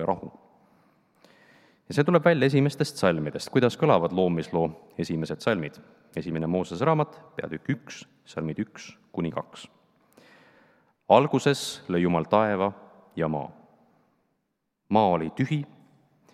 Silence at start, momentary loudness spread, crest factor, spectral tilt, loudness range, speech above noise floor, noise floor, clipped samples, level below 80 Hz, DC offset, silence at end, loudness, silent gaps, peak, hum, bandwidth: 0 s; 17 LU; 24 dB; -6.5 dB/octave; 7 LU; 53 dB; -78 dBFS; under 0.1%; -66 dBFS; under 0.1%; 0.7 s; -26 LUFS; none; -4 dBFS; none; 14 kHz